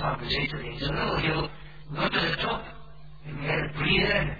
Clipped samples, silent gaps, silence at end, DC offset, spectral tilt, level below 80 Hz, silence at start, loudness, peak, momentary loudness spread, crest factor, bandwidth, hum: under 0.1%; none; 0 s; 0.6%; -7 dB/octave; -42 dBFS; 0 s; -27 LUFS; -10 dBFS; 16 LU; 18 dB; 5 kHz; none